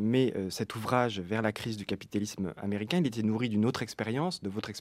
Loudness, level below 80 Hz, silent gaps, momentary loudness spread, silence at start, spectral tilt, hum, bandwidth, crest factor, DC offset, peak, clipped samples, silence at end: -32 LUFS; -66 dBFS; none; 7 LU; 0 s; -6 dB/octave; none; 15.5 kHz; 20 dB; under 0.1%; -12 dBFS; under 0.1%; 0 s